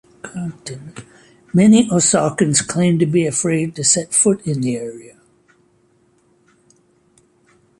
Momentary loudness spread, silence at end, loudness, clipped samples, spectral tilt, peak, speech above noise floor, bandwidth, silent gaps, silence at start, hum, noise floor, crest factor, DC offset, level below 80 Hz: 20 LU; 2.7 s; -16 LUFS; under 0.1%; -4.5 dB/octave; -2 dBFS; 41 dB; 11.5 kHz; none; 0.25 s; none; -58 dBFS; 18 dB; under 0.1%; -56 dBFS